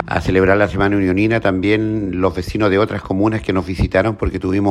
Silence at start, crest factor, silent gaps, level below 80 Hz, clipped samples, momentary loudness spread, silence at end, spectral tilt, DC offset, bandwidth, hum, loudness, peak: 0 s; 16 dB; none; -32 dBFS; under 0.1%; 5 LU; 0 s; -7.5 dB/octave; under 0.1%; 12.5 kHz; none; -17 LUFS; 0 dBFS